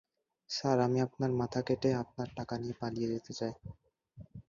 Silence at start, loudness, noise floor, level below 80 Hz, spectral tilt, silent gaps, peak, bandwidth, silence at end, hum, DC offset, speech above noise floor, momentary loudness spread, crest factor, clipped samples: 0.5 s; -34 LUFS; -56 dBFS; -64 dBFS; -6.5 dB/octave; none; -16 dBFS; 7.4 kHz; 0.1 s; none; under 0.1%; 22 dB; 11 LU; 20 dB; under 0.1%